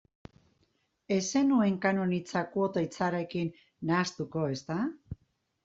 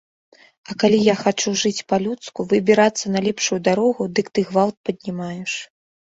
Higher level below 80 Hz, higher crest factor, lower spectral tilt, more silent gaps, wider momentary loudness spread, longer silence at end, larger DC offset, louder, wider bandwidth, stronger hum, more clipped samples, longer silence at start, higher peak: about the same, -64 dBFS vs -60 dBFS; about the same, 20 dB vs 18 dB; about the same, -5.5 dB/octave vs -4.5 dB/octave; second, none vs 4.77-4.84 s; about the same, 11 LU vs 12 LU; about the same, 0.5 s vs 0.4 s; neither; second, -30 LUFS vs -20 LUFS; about the same, 7.8 kHz vs 8 kHz; neither; neither; first, 1.1 s vs 0.7 s; second, -12 dBFS vs -2 dBFS